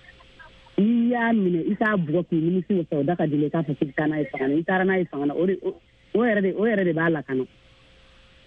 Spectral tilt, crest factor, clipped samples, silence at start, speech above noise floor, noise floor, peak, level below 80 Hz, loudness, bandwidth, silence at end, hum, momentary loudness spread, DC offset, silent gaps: -10 dB/octave; 14 dB; under 0.1%; 0.4 s; 30 dB; -53 dBFS; -10 dBFS; -60 dBFS; -23 LUFS; 4.7 kHz; 1 s; none; 6 LU; under 0.1%; none